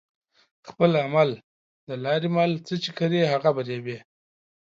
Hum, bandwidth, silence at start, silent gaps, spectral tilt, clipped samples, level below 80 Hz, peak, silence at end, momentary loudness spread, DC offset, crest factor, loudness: none; 7.6 kHz; 0.65 s; 1.44-1.87 s; -7 dB/octave; under 0.1%; -72 dBFS; -6 dBFS; 0.7 s; 14 LU; under 0.1%; 20 dB; -24 LUFS